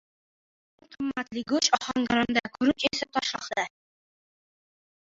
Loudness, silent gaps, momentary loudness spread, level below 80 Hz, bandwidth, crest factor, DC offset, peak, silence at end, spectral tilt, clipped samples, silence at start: -27 LUFS; none; 9 LU; -62 dBFS; 7.8 kHz; 24 dB; under 0.1%; -6 dBFS; 1.45 s; -2.5 dB/octave; under 0.1%; 0.9 s